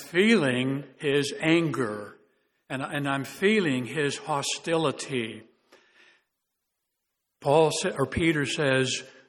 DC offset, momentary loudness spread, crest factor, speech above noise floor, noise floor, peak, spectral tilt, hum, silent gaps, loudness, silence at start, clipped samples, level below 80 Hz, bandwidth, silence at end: under 0.1%; 10 LU; 20 dB; 56 dB; -81 dBFS; -8 dBFS; -4.5 dB/octave; none; none; -26 LUFS; 0 s; under 0.1%; -58 dBFS; 18.5 kHz; 0.2 s